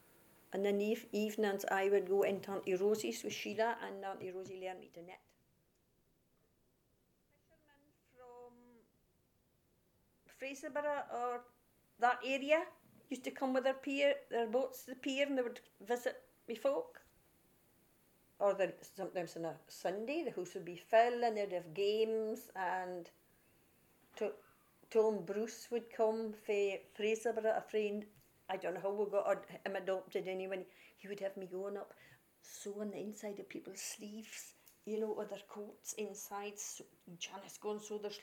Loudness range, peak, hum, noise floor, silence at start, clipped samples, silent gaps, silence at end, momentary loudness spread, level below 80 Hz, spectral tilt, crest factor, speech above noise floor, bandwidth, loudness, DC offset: 9 LU; -18 dBFS; none; -77 dBFS; 0.5 s; under 0.1%; none; 0 s; 15 LU; -86 dBFS; -4 dB/octave; 22 dB; 38 dB; 18 kHz; -39 LUFS; under 0.1%